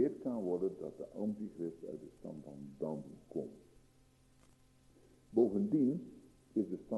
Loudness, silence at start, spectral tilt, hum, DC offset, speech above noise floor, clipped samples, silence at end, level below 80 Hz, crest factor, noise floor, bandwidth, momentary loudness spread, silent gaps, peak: -39 LUFS; 0 s; -10 dB/octave; none; under 0.1%; 30 dB; under 0.1%; 0 s; -72 dBFS; 20 dB; -68 dBFS; 12 kHz; 17 LU; none; -18 dBFS